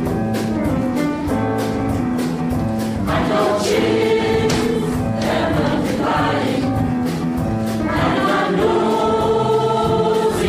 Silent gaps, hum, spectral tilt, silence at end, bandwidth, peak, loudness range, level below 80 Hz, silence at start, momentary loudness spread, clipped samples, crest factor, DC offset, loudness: none; none; -6 dB/octave; 0 s; 16 kHz; -6 dBFS; 2 LU; -36 dBFS; 0 s; 4 LU; under 0.1%; 12 dB; under 0.1%; -18 LUFS